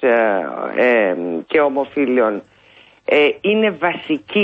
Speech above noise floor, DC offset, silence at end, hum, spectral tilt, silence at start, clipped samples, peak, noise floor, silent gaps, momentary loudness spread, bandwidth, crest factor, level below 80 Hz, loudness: 32 dB; under 0.1%; 0 s; none; -7 dB/octave; 0 s; under 0.1%; -4 dBFS; -49 dBFS; none; 8 LU; 5.4 kHz; 14 dB; -64 dBFS; -17 LUFS